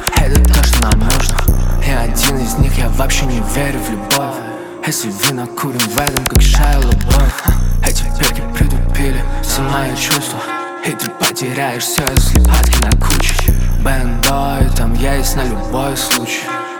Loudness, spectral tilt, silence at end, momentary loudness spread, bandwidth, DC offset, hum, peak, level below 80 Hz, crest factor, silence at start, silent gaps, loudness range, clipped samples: -15 LUFS; -4 dB/octave; 0 s; 7 LU; 19.5 kHz; under 0.1%; none; 0 dBFS; -14 dBFS; 12 dB; 0 s; none; 3 LU; under 0.1%